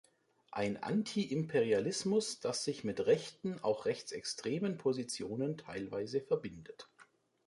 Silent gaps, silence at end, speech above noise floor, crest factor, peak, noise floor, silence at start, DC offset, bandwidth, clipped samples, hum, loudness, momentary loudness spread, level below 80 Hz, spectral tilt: none; 0.45 s; 30 dB; 18 dB; -18 dBFS; -66 dBFS; 0.5 s; under 0.1%; 11.5 kHz; under 0.1%; none; -36 LUFS; 9 LU; -72 dBFS; -5 dB/octave